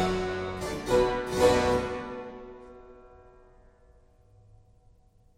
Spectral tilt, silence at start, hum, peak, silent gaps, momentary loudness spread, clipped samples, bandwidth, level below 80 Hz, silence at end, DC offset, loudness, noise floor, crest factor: -5 dB/octave; 0 s; none; -10 dBFS; none; 23 LU; under 0.1%; 16 kHz; -46 dBFS; 2.3 s; under 0.1%; -27 LUFS; -60 dBFS; 22 dB